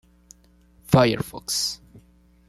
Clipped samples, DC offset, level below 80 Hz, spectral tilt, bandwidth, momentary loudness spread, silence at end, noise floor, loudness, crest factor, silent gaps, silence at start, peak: under 0.1%; under 0.1%; -52 dBFS; -4.5 dB/octave; 15 kHz; 10 LU; 0.75 s; -56 dBFS; -22 LUFS; 22 dB; none; 0.9 s; -4 dBFS